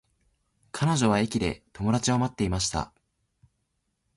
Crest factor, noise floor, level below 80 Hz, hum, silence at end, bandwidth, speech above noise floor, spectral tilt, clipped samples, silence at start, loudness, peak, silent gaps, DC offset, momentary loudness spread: 20 dB; -77 dBFS; -46 dBFS; none; 1.3 s; 11.5 kHz; 51 dB; -5 dB/octave; under 0.1%; 0.75 s; -26 LUFS; -10 dBFS; none; under 0.1%; 9 LU